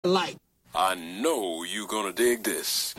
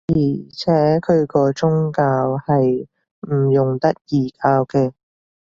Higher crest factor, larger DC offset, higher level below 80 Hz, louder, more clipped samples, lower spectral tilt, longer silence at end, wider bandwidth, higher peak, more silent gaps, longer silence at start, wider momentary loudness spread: about the same, 16 dB vs 16 dB; neither; second, -66 dBFS vs -50 dBFS; second, -27 LUFS vs -18 LUFS; neither; second, -2.5 dB/octave vs -8.5 dB/octave; second, 0.05 s vs 0.6 s; first, 16.5 kHz vs 7.4 kHz; second, -10 dBFS vs -2 dBFS; second, none vs 3.11-3.22 s; about the same, 0.05 s vs 0.1 s; about the same, 7 LU vs 8 LU